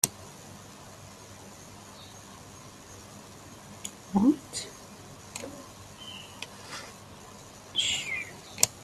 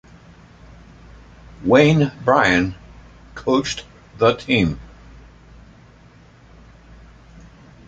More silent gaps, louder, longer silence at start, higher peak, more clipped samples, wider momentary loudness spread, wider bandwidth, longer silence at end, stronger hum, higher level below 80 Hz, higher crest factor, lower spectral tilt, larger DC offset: neither; second, -31 LUFS vs -18 LUFS; second, 0.05 s vs 1.6 s; about the same, 0 dBFS vs -2 dBFS; neither; first, 20 LU vs 16 LU; first, 15.5 kHz vs 8.8 kHz; second, 0 s vs 3 s; second, none vs 60 Hz at -50 dBFS; second, -64 dBFS vs -44 dBFS; first, 34 dB vs 20 dB; second, -2.5 dB/octave vs -6 dB/octave; neither